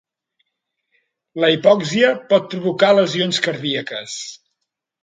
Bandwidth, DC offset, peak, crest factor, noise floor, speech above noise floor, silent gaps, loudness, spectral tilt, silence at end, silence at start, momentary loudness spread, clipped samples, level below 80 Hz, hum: 9.4 kHz; under 0.1%; 0 dBFS; 18 dB; -77 dBFS; 60 dB; none; -17 LUFS; -4.5 dB/octave; 0.7 s; 1.35 s; 14 LU; under 0.1%; -68 dBFS; none